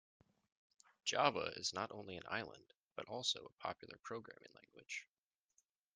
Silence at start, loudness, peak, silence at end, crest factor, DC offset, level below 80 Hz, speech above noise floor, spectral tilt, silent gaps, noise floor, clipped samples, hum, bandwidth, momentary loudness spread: 1.05 s; -43 LUFS; -18 dBFS; 0.95 s; 28 dB; under 0.1%; -84 dBFS; 38 dB; -2 dB/octave; 2.75-2.87 s; -82 dBFS; under 0.1%; none; 10 kHz; 18 LU